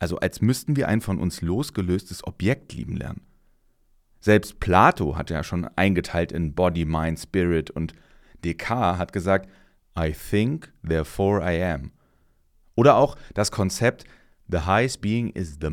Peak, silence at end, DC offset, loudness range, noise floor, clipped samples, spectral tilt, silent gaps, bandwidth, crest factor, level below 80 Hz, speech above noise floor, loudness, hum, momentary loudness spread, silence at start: -2 dBFS; 0 s; under 0.1%; 4 LU; -62 dBFS; under 0.1%; -6 dB/octave; none; 17 kHz; 22 dB; -40 dBFS; 39 dB; -24 LUFS; none; 12 LU; 0 s